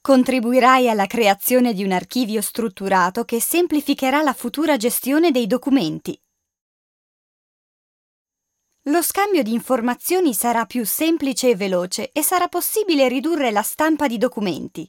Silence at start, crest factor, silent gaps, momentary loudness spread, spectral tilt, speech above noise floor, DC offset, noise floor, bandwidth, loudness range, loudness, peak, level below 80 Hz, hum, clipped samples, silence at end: 0.05 s; 18 dB; 6.61-8.25 s; 6 LU; -3.5 dB/octave; 58 dB; under 0.1%; -76 dBFS; 17 kHz; 7 LU; -19 LUFS; -2 dBFS; -62 dBFS; none; under 0.1%; 0.05 s